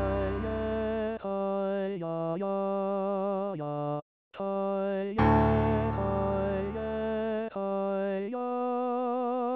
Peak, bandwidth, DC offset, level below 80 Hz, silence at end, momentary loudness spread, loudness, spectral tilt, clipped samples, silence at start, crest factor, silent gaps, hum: -12 dBFS; 5.8 kHz; under 0.1%; -44 dBFS; 0 s; 7 LU; -30 LUFS; -10.5 dB/octave; under 0.1%; 0 s; 16 dB; 4.02-4.31 s; none